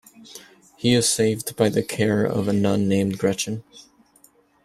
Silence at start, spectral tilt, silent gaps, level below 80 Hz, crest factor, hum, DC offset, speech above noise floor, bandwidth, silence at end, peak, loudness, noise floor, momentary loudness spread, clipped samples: 0.2 s; -4.5 dB/octave; none; -58 dBFS; 20 dB; none; under 0.1%; 36 dB; 15 kHz; 0.85 s; -4 dBFS; -21 LUFS; -57 dBFS; 20 LU; under 0.1%